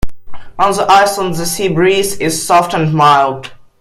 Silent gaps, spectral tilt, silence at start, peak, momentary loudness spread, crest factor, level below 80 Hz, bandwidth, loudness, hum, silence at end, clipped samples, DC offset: none; -4 dB/octave; 0 s; 0 dBFS; 15 LU; 12 dB; -34 dBFS; 16 kHz; -12 LUFS; none; 0.25 s; under 0.1%; under 0.1%